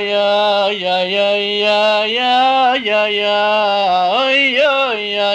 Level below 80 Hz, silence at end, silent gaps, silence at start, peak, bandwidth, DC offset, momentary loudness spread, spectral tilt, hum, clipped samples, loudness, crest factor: -62 dBFS; 0 s; none; 0 s; -4 dBFS; 9.2 kHz; under 0.1%; 4 LU; -3.5 dB/octave; none; under 0.1%; -14 LUFS; 10 dB